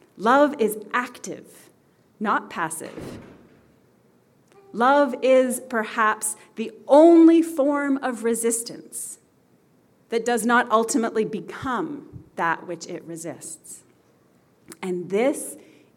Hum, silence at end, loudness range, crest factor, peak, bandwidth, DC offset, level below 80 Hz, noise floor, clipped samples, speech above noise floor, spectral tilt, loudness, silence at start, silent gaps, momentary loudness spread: none; 0.4 s; 13 LU; 20 dB; -4 dBFS; 16.5 kHz; under 0.1%; -68 dBFS; -60 dBFS; under 0.1%; 38 dB; -4 dB/octave; -21 LUFS; 0.2 s; none; 19 LU